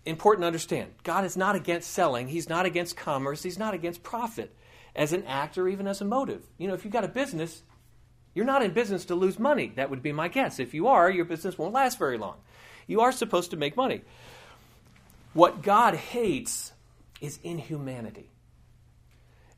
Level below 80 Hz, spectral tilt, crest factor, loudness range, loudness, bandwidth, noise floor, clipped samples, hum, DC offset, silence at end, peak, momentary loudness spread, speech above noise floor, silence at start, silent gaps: -62 dBFS; -4.5 dB/octave; 26 dB; 5 LU; -27 LUFS; 15.5 kHz; -58 dBFS; under 0.1%; none; under 0.1%; 1.35 s; -2 dBFS; 14 LU; 31 dB; 0.05 s; none